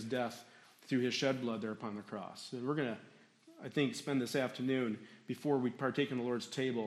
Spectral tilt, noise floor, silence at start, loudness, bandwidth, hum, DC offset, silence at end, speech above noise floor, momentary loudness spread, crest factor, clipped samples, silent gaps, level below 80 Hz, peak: -5.5 dB/octave; -61 dBFS; 0 s; -37 LUFS; 14 kHz; none; under 0.1%; 0 s; 24 dB; 11 LU; 18 dB; under 0.1%; none; -84 dBFS; -20 dBFS